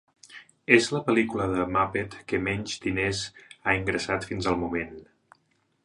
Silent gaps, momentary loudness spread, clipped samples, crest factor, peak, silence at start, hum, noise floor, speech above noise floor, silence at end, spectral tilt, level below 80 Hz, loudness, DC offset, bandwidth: none; 13 LU; under 0.1%; 26 dB; -2 dBFS; 0.3 s; none; -70 dBFS; 43 dB; 0.8 s; -5 dB/octave; -50 dBFS; -26 LUFS; under 0.1%; 11 kHz